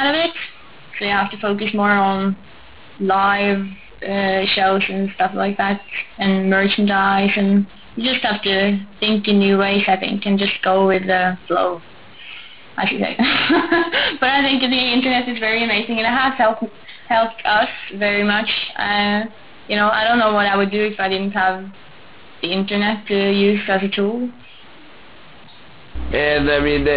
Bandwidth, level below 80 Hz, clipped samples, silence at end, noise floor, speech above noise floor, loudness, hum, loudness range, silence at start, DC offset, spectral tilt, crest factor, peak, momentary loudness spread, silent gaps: 4 kHz; -44 dBFS; under 0.1%; 0 s; -44 dBFS; 26 dB; -17 LUFS; none; 4 LU; 0 s; 0.8%; -9 dB/octave; 14 dB; -4 dBFS; 12 LU; none